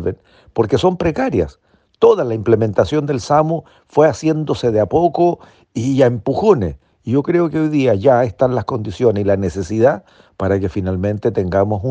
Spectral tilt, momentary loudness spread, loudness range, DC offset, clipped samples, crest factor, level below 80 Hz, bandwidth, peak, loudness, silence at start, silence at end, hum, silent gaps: -7.5 dB/octave; 9 LU; 1 LU; under 0.1%; under 0.1%; 16 dB; -44 dBFS; 9 kHz; 0 dBFS; -16 LUFS; 0 s; 0 s; none; none